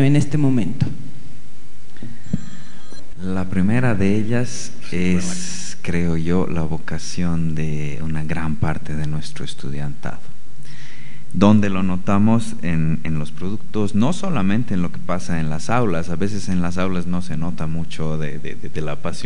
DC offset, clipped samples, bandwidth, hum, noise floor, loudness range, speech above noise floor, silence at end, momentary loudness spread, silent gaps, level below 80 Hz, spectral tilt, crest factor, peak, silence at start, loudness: 20%; under 0.1%; 11 kHz; none; -42 dBFS; 6 LU; 21 dB; 0 s; 15 LU; none; -44 dBFS; -6.5 dB/octave; 22 dB; -2 dBFS; 0 s; -22 LUFS